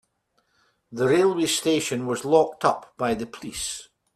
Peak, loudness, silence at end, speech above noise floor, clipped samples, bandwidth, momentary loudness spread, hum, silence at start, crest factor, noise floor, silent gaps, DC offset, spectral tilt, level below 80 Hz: -4 dBFS; -24 LUFS; 0.35 s; 47 dB; under 0.1%; 15 kHz; 11 LU; none; 0.9 s; 20 dB; -71 dBFS; none; under 0.1%; -4 dB/octave; -58 dBFS